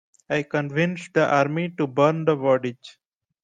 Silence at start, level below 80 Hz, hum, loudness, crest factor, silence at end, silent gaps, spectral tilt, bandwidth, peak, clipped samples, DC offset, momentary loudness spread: 0.3 s; -66 dBFS; none; -23 LUFS; 18 dB; 0.55 s; none; -7 dB/octave; 9.4 kHz; -6 dBFS; under 0.1%; under 0.1%; 6 LU